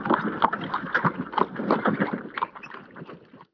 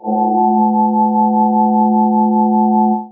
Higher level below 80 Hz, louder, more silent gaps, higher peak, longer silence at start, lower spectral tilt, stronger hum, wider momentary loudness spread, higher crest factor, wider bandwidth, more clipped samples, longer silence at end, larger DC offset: first, -64 dBFS vs -78 dBFS; second, -26 LUFS vs -13 LUFS; neither; about the same, -2 dBFS vs -2 dBFS; about the same, 0 s vs 0.05 s; second, -8 dB/octave vs -17 dB/octave; neither; first, 19 LU vs 1 LU; first, 24 dB vs 10 dB; first, 5.4 kHz vs 1 kHz; neither; about the same, 0.1 s vs 0 s; neither